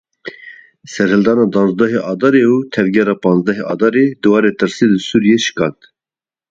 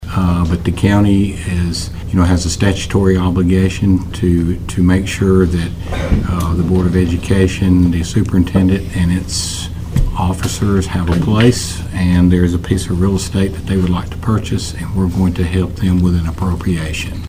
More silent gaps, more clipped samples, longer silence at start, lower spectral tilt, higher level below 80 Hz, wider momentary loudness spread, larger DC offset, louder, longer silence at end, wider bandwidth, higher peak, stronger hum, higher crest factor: neither; neither; first, 0.25 s vs 0 s; about the same, -6 dB/octave vs -6.5 dB/octave; second, -54 dBFS vs -24 dBFS; about the same, 7 LU vs 7 LU; neither; about the same, -13 LUFS vs -15 LUFS; first, 0.8 s vs 0 s; second, 7.8 kHz vs 16 kHz; about the same, 0 dBFS vs 0 dBFS; neither; about the same, 14 dB vs 14 dB